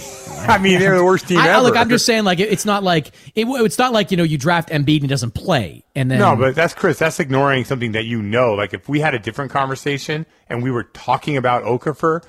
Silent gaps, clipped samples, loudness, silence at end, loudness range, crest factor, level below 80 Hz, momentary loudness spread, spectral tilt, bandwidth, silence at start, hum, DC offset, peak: none; under 0.1%; -17 LUFS; 0.1 s; 6 LU; 16 dB; -48 dBFS; 10 LU; -5 dB/octave; 16 kHz; 0 s; none; under 0.1%; 0 dBFS